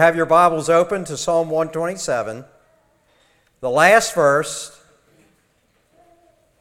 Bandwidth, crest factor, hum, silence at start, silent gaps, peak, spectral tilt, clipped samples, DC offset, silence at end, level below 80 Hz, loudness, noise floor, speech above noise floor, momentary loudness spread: 16 kHz; 20 dB; none; 0 s; none; 0 dBFS; -4 dB/octave; under 0.1%; under 0.1%; 1.9 s; -56 dBFS; -17 LUFS; -62 dBFS; 45 dB; 16 LU